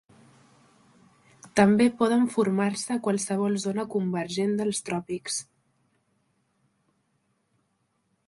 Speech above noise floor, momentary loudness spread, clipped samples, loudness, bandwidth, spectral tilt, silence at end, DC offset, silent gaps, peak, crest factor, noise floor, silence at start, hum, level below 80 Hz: 48 dB; 10 LU; under 0.1%; -26 LUFS; 11.5 kHz; -5 dB/octave; 2.85 s; under 0.1%; none; -6 dBFS; 22 dB; -73 dBFS; 1.45 s; none; -66 dBFS